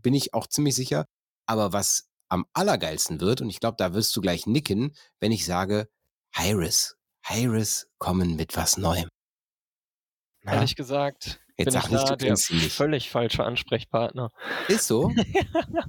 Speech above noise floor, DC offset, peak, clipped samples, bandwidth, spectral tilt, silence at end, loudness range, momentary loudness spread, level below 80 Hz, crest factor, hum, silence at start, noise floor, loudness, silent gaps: over 65 dB; under 0.1%; -8 dBFS; under 0.1%; 17.5 kHz; -4 dB/octave; 0 s; 3 LU; 8 LU; -48 dBFS; 18 dB; none; 0.05 s; under -90 dBFS; -25 LUFS; 1.10-1.43 s, 2.12-2.18 s, 6.12-6.22 s, 9.15-10.29 s